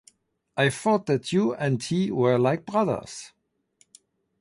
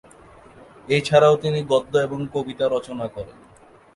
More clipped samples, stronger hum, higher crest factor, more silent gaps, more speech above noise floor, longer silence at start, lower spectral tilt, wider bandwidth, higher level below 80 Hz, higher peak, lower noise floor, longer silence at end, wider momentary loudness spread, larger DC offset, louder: neither; neither; about the same, 18 dB vs 20 dB; neither; first, 42 dB vs 27 dB; second, 0.55 s vs 0.85 s; about the same, -6 dB/octave vs -6 dB/octave; about the same, 11.5 kHz vs 11.5 kHz; second, -64 dBFS vs -54 dBFS; second, -8 dBFS vs -2 dBFS; first, -65 dBFS vs -47 dBFS; first, 1.15 s vs 0.65 s; second, 10 LU vs 15 LU; neither; second, -25 LUFS vs -21 LUFS